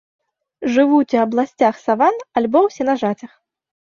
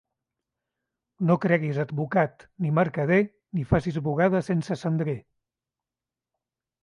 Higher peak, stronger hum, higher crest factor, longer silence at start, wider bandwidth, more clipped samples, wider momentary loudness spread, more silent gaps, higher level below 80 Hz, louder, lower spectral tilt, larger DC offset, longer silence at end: first, -2 dBFS vs -8 dBFS; neither; about the same, 16 dB vs 18 dB; second, 0.6 s vs 1.2 s; second, 7.2 kHz vs 10.5 kHz; neither; about the same, 7 LU vs 7 LU; neither; second, -64 dBFS vs -52 dBFS; first, -17 LUFS vs -25 LUFS; second, -6 dB/octave vs -8.5 dB/octave; neither; second, 0.7 s vs 1.65 s